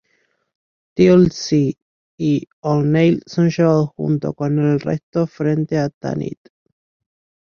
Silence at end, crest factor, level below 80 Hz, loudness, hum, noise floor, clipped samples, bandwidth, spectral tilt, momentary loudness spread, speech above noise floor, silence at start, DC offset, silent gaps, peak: 1.25 s; 16 dB; -52 dBFS; -18 LUFS; none; -65 dBFS; under 0.1%; 7 kHz; -7.5 dB/octave; 11 LU; 48 dB; 0.95 s; under 0.1%; 1.82-2.18 s, 2.53-2.63 s, 5.03-5.13 s, 5.94-6.01 s; -2 dBFS